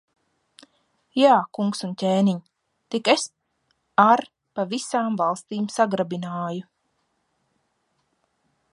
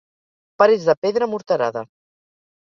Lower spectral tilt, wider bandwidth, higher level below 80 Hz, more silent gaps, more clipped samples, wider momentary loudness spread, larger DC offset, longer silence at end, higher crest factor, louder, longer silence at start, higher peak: about the same, -5 dB/octave vs -5.5 dB/octave; first, 11.5 kHz vs 7.2 kHz; second, -74 dBFS vs -68 dBFS; second, none vs 0.97-1.02 s; neither; first, 13 LU vs 8 LU; neither; first, 2.1 s vs 0.85 s; about the same, 22 dB vs 18 dB; second, -23 LUFS vs -19 LUFS; first, 1.15 s vs 0.6 s; about the same, -2 dBFS vs -2 dBFS